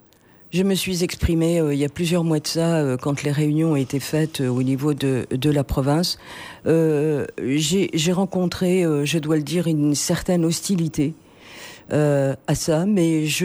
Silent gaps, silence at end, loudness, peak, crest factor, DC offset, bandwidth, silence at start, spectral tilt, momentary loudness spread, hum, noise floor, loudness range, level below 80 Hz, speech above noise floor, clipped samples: none; 0 s; -21 LUFS; -6 dBFS; 14 dB; under 0.1%; over 20 kHz; 0.55 s; -5.5 dB/octave; 4 LU; none; -51 dBFS; 1 LU; -42 dBFS; 31 dB; under 0.1%